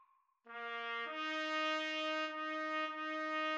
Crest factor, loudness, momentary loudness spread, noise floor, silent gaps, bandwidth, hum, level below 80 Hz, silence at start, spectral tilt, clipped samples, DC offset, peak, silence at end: 16 dB; -39 LUFS; 7 LU; -67 dBFS; none; 8.6 kHz; none; under -90 dBFS; 0.45 s; -0.5 dB/octave; under 0.1%; under 0.1%; -24 dBFS; 0 s